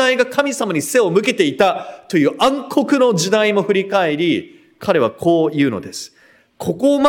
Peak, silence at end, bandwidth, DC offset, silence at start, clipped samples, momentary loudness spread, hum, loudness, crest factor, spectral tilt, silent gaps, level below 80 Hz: 0 dBFS; 0 s; 17 kHz; under 0.1%; 0 s; under 0.1%; 11 LU; none; -16 LUFS; 16 dB; -4.5 dB/octave; none; -60 dBFS